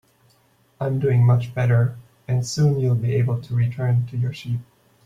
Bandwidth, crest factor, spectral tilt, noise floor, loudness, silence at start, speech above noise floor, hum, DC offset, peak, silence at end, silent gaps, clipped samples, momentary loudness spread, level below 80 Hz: 9 kHz; 14 dB; -7.5 dB/octave; -60 dBFS; -21 LUFS; 0.8 s; 40 dB; none; under 0.1%; -8 dBFS; 0.45 s; none; under 0.1%; 11 LU; -54 dBFS